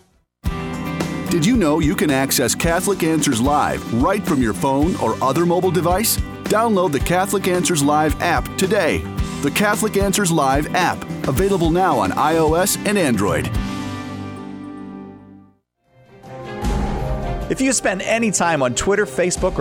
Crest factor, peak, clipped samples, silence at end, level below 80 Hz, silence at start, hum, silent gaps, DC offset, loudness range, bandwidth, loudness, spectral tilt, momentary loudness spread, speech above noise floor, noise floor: 16 dB; -2 dBFS; under 0.1%; 0 s; -32 dBFS; 0.45 s; none; none; under 0.1%; 8 LU; over 20 kHz; -18 LUFS; -4.5 dB/octave; 11 LU; 40 dB; -57 dBFS